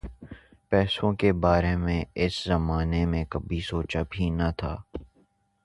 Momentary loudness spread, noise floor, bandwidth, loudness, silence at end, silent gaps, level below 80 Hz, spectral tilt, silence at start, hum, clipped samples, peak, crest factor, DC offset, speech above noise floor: 16 LU; -66 dBFS; 11.5 kHz; -27 LUFS; 0.6 s; none; -36 dBFS; -7 dB/octave; 0.05 s; none; under 0.1%; -8 dBFS; 20 dB; under 0.1%; 40 dB